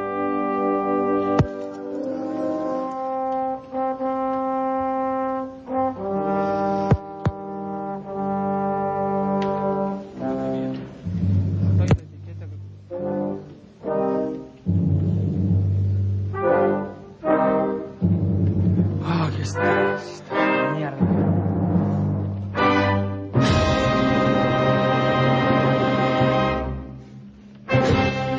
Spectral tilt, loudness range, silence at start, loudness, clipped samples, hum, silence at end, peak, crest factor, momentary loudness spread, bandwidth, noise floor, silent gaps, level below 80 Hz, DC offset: -7.5 dB/octave; 6 LU; 0 s; -22 LUFS; under 0.1%; none; 0 s; -4 dBFS; 18 dB; 11 LU; 8 kHz; -42 dBFS; none; -38 dBFS; under 0.1%